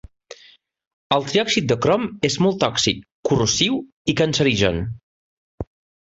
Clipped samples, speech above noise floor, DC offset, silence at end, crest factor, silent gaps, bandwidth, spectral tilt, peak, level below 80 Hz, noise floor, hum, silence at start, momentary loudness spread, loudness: under 0.1%; 33 dB; under 0.1%; 0.5 s; 18 dB; 3.12-3.23 s, 3.92-4.05 s, 5.03-5.58 s; 8.2 kHz; -4 dB/octave; -2 dBFS; -44 dBFS; -52 dBFS; none; 1.1 s; 16 LU; -20 LUFS